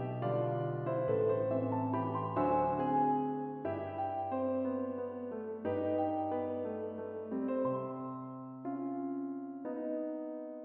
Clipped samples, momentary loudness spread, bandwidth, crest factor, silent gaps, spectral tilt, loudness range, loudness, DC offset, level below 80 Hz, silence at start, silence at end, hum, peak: under 0.1%; 10 LU; 4.3 kHz; 16 dB; none; -8.5 dB/octave; 6 LU; -36 LUFS; under 0.1%; -70 dBFS; 0 s; 0 s; none; -20 dBFS